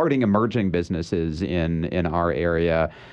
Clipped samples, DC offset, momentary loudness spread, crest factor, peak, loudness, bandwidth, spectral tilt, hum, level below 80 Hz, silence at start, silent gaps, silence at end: under 0.1%; under 0.1%; 5 LU; 16 dB; -6 dBFS; -23 LUFS; 8.8 kHz; -8 dB/octave; none; -40 dBFS; 0 s; none; 0 s